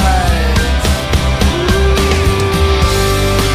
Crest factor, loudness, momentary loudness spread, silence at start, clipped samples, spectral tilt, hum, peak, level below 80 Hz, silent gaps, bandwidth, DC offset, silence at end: 10 dB; -13 LUFS; 2 LU; 0 s; under 0.1%; -5 dB/octave; none; 0 dBFS; -16 dBFS; none; 16 kHz; under 0.1%; 0 s